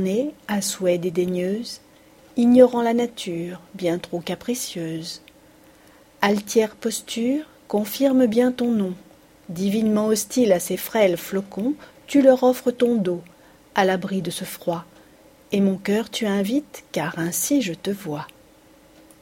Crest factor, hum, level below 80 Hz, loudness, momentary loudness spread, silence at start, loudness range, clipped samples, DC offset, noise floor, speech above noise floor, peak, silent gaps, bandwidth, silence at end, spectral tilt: 22 dB; none; -62 dBFS; -22 LUFS; 13 LU; 0 s; 5 LU; under 0.1%; under 0.1%; -52 dBFS; 31 dB; 0 dBFS; none; 16.5 kHz; 0.95 s; -5 dB/octave